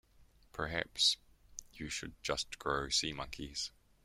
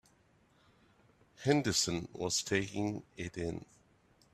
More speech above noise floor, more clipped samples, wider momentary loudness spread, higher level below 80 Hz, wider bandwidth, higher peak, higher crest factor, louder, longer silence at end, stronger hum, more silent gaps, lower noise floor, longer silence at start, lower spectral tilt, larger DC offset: second, 27 dB vs 34 dB; neither; first, 18 LU vs 12 LU; first, -58 dBFS vs -64 dBFS; first, 16.5 kHz vs 14.5 kHz; about the same, -16 dBFS vs -14 dBFS; about the same, 22 dB vs 24 dB; about the same, -36 LUFS vs -34 LUFS; second, 0.35 s vs 0.7 s; neither; neither; second, -65 dBFS vs -69 dBFS; second, 0.2 s vs 1.4 s; second, -1.5 dB/octave vs -3.5 dB/octave; neither